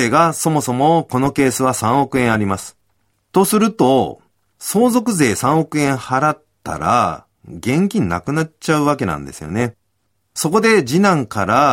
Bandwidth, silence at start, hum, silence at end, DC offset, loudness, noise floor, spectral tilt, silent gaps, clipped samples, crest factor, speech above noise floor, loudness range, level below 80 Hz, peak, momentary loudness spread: 16.5 kHz; 0 s; none; 0 s; under 0.1%; -16 LUFS; -69 dBFS; -5 dB/octave; none; under 0.1%; 16 dB; 53 dB; 3 LU; -48 dBFS; -2 dBFS; 11 LU